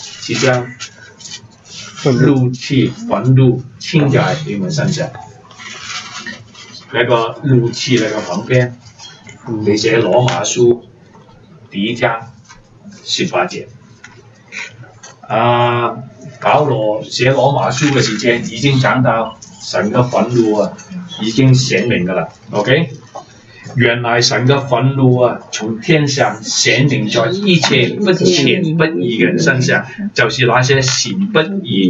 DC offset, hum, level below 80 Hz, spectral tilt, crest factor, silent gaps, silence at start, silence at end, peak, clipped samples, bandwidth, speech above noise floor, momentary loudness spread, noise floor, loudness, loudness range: under 0.1%; none; -50 dBFS; -5 dB/octave; 14 dB; none; 0 s; 0 s; 0 dBFS; under 0.1%; 8 kHz; 28 dB; 18 LU; -41 dBFS; -14 LUFS; 6 LU